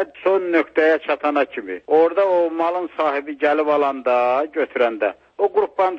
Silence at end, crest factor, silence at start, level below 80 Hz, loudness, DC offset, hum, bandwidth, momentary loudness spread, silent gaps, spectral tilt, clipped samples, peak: 0 s; 14 dB; 0 s; -66 dBFS; -19 LUFS; under 0.1%; none; 6.6 kHz; 6 LU; none; -5.5 dB/octave; under 0.1%; -4 dBFS